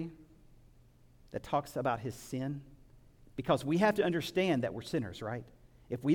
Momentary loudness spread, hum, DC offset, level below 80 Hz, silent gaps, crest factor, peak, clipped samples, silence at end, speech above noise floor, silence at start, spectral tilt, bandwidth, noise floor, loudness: 16 LU; none; under 0.1%; -62 dBFS; none; 20 dB; -16 dBFS; under 0.1%; 0 s; 28 dB; 0 s; -6.5 dB/octave; 18 kHz; -61 dBFS; -34 LUFS